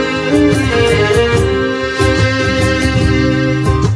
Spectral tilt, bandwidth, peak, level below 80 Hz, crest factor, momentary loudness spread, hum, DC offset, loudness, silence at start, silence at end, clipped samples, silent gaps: -6 dB/octave; 11 kHz; 0 dBFS; -24 dBFS; 12 dB; 3 LU; none; under 0.1%; -12 LUFS; 0 s; 0 s; under 0.1%; none